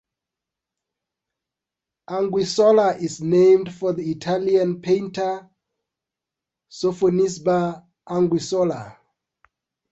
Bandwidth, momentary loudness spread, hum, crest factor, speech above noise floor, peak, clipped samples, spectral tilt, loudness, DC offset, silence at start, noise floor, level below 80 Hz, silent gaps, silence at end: 8.2 kHz; 11 LU; none; 16 dB; 67 dB; -6 dBFS; under 0.1%; -6 dB/octave; -20 LUFS; under 0.1%; 2.1 s; -87 dBFS; -62 dBFS; none; 1 s